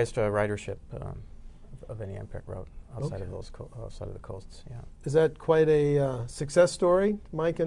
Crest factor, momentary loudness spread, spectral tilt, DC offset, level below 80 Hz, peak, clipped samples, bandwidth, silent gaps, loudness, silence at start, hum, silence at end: 18 dB; 21 LU; -6.5 dB/octave; under 0.1%; -46 dBFS; -10 dBFS; under 0.1%; 11 kHz; none; -26 LUFS; 0 s; none; 0 s